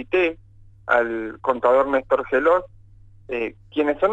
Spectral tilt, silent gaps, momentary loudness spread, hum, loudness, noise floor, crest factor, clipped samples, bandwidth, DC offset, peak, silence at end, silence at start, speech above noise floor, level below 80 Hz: -6.5 dB/octave; none; 10 LU; none; -21 LUFS; -47 dBFS; 16 dB; under 0.1%; 7.8 kHz; under 0.1%; -4 dBFS; 0 s; 0 s; 27 dB; -52 dBFS